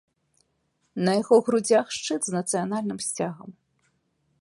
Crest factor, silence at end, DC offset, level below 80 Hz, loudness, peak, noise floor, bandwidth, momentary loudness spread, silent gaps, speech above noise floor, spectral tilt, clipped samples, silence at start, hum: 20 dB; 0.9 s; under 0.1%; -72 dBFS; -24 LUFS; -6 dBFS; -72 dBFS; 11.5 kHz; 11 LU; none; 48 dB; -4.5 dB/octave; under 0.1%; 0.95 s; none